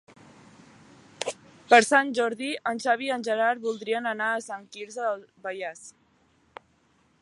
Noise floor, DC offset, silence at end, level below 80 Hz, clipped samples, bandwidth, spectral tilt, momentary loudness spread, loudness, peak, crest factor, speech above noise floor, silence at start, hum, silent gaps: -65 dBFS; under 0.1%; 1.3 s; -78 dBFS; under 0.1%; 11.5 kHz; -2.5 dB/octave; 18 LU; -26 LUFS; -2 dBFS; 26 dB; 39 dB; 1.2 s; none; none